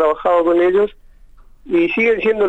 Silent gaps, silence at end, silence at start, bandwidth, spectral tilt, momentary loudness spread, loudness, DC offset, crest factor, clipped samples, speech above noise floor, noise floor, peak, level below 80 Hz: none; 0 s; 0 s; 7.4 kHz; -7 dB/octave; 5 LU; -15 LUFS; under 0.1%; 10 dB; under 0.1%; 28 dB; -43 dBFS; -6 dBFS; -44 dBFS